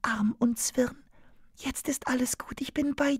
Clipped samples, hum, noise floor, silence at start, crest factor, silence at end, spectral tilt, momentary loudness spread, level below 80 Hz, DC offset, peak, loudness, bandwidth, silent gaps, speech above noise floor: under 0.1%; none; -55 dBFS; 0.05 s; 18 dB; 0 s; -3.5 dB/octave; 7 LU; -54 dBFS; under 0.1%; -12 dBFS; -30 LUFS; 16 kHz; none; 26 dB